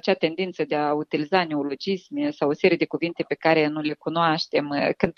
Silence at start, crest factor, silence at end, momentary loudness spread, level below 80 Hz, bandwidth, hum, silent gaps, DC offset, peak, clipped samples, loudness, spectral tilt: 0.05 s; 20 dB; 0.05 s; 7 LU; -62 dBFS; 6.8 kHz; none; none; under 0.1%; -4 dBFS; under 0.1%; -24 LUFS; -6.5 dB/octave